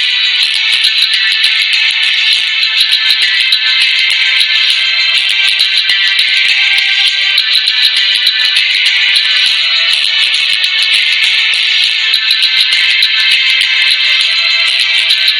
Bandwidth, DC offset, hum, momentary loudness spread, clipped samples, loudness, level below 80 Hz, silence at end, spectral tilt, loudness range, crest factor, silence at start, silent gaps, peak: over 20 kHz; under 0.1%; none; 1 LU; 0.5%; -7 LUFS; -64 dBFS; 0 s; 4.5 dB/octave; 0 LU; 10 dB; 0 s; none; 0 dBFS